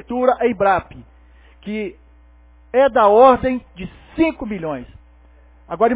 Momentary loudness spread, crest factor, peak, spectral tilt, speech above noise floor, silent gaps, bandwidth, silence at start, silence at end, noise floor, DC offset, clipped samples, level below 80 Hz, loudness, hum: 20 LU; 18 dB; 0 dBFS; -10 dB/octave; 31 dB; none; 4 kHz; 0.1 s; 0 s; -48 dBFS; under 0.1%; under 0.1%; -44 dBFS; -17 LUFS; 60 Hz at -45 dBFS